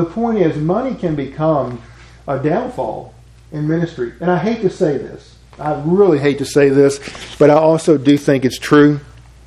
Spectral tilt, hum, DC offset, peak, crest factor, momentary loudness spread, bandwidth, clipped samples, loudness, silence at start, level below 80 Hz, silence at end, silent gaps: -6.5 dB/octave; none; under 0.1%; 0 dBFS; 16 dB; 14 LU; 13.5 kHz; under 0.1%; -15 LUFS; 0 s; -44 dBFS; 0.4 s; none